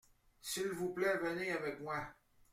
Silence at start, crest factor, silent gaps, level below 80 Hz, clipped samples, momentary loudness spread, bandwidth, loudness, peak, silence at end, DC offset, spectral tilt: 0.45 s; 18 dB; none; -70 dBFS; under 0.1%; 8 LU; 16.5 kHz; -39 LUFS; -22 dBFS; 0.4 s; under 0.1%; -4 dB/octave